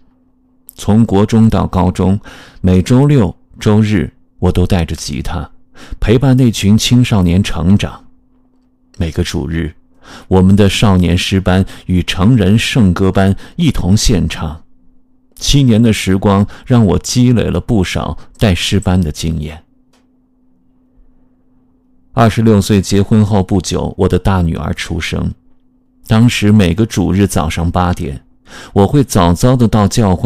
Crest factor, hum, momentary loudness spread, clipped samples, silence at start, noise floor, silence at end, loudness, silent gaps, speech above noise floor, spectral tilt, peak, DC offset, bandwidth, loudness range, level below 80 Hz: 12 dB; none; 10 LU; 1%; 0.8 s; -52 dBFS; 0 s; -12 LUFS; none; 41 dB; -6 dB/octave; 0 dBFS; under 0.1%; 15.5 kHz; 5 LU; -28 dBFS